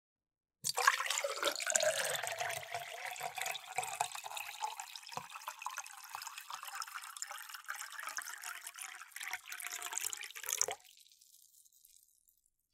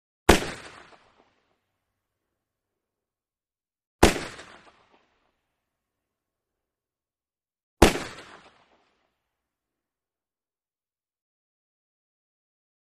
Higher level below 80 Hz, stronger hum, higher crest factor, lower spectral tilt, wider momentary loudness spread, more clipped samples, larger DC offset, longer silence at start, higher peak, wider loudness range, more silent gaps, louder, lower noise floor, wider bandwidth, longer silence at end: second, under -90 dBFS vs -40 dBFS; neither; about the same, 32 dB vs 30 dB; second, 1 dB/octave vs -4 dB/octave; second, 14 LU vs 24 LU; neither; neither; first, 0.65 s vs 0.3 s; second, -10 dBFS vs -2 dBFS; first, 9 LU vs 1 LU; second, none vs 3.87-3.99 s, 7.63-7.77 s; second, -39 LUFS vs -23 LUFS; second, -75 dBFS vs under -90 dBFS; first, 16.5 kHz vs 14.5 kHz; second, 0.8 s vs 4.8 s